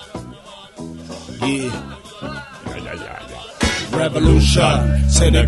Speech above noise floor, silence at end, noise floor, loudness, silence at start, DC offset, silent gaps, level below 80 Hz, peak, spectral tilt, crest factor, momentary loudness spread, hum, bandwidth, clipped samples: 24 dB; 0 s; -39 dBFS; -17 LUFS; 0 s; under 0.1%; none; -22 dBFS; 0 dBFS; -5 dB/octave; 18 dB; 20 LU; none; 11.5 kHz; under 0.1%